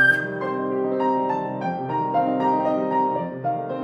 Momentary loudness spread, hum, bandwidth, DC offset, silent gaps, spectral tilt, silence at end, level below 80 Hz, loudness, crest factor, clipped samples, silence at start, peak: 5 LU; none; 12 kHz; under 0.1%; none; -7.5 dB/octave; 0 s; -70 dBFS; -23 LUFS; 14 dB; under 0.1%; 0 s; -8 dBFS